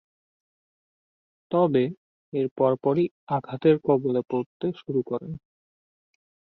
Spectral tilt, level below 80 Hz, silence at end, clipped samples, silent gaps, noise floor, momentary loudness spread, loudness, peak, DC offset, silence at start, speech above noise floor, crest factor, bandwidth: -10.5 dB/octave; -66 dBFS; 1.15 s; under 0.1%; 1.97-2.32 s, 2.51-2.56 s, 3.11-3.27 s, 4.46-4.60 s; under -90 dBFS; 10 LU; -25 LUFS; -8 dBFS; under 0.1%; 1.5 s; over 66 dB; 20 dB; 4.5 kHz